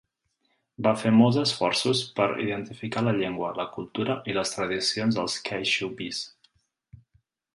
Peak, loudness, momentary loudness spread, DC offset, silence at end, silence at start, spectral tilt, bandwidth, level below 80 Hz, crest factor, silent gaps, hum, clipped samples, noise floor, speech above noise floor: -6 dBFS; -26 LUFS; 12 LU; under 0.1%; 1.25 s; 0.8 s; -4.5 dB/octave; 11.5 kHz; -62 dBFS; 20 dB; none; none; under 0.1%; -74 dBFS; 48 dB